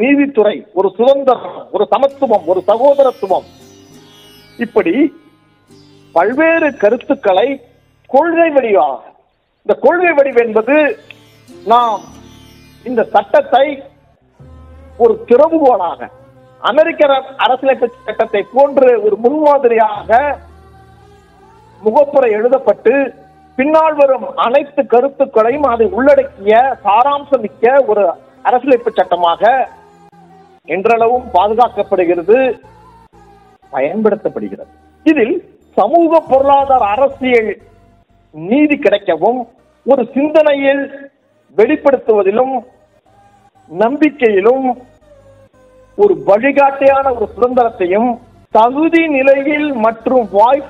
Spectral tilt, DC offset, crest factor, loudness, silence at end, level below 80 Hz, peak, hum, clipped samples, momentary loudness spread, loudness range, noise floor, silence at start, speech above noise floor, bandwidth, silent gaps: -6.5 dB/octave; under 0.1%; 12 dB; -12 LUFS; 0 s; -50 dBFS; 0 dBFS; none; 0.3%; 9 LU; 4 LU; -56 dBFS; 0 s; 44 dB; 6.8 kHz; none